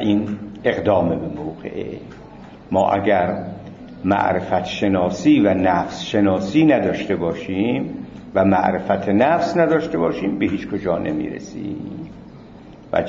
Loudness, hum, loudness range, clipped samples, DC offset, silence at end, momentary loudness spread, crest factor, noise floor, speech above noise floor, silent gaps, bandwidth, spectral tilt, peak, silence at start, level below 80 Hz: -19 LUFS; none; 4 LU; under 0.1%; under 0.1%; 0 s; 16 LU; 16 dB; -41 dBFS; 22 dB; none; 7.4 kHz; -7 dB/octave; -2 dBFS; 0 s; -50 dBFS